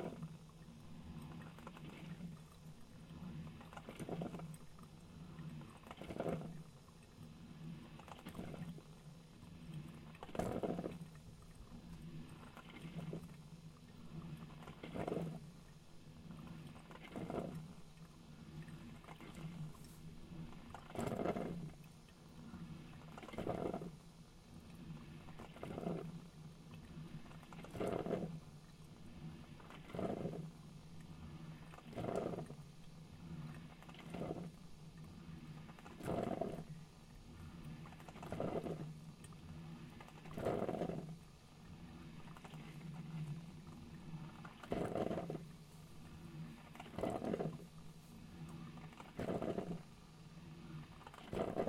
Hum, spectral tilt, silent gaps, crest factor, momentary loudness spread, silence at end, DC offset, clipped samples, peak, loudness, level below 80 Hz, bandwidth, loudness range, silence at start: none; -7 dB/octave; none; 24 dB; 16 LU; 0 s; under 0.1%; under 0.1%; -24 dBFS; -49 LUFS; -64 dBFS; 16 kHz; 6 LU; 0 s